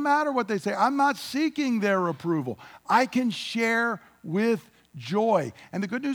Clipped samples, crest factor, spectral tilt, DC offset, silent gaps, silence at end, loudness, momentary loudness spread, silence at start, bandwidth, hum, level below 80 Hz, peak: under 0.1%; 18 dB; -5.5 dB/octave; under 0.1%; none; 0 s; -26 LUFS; 9 LU; 0 s; 20 kHz; none; -72 dBFS; -8 dBFS